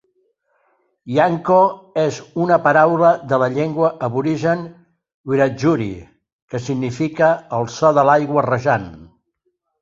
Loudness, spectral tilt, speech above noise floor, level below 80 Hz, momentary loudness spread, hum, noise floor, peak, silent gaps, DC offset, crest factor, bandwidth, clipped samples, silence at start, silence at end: -17 LUFS; -7 dB/octave; 54 dB; -54 dBFS; 11 LU; none; -70 dBFS; -2 dBFS; 5.14-5.24 s, 6.32-6.48 s; under 0.1%; 16 dB; 7.8 kHz; under 0.1%; 1.05 s; 0.8 s